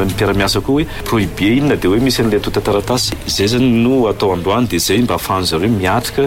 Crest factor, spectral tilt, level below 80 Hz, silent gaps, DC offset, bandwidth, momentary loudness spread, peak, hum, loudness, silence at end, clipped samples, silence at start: 10 dB; -5 dB/octave; -32 dBFS; none; under 0.1%; 16.5 kHz; 4 LU; -4 dBFS; none; -14 LUFS; 0 s; under 0.1%; 0 s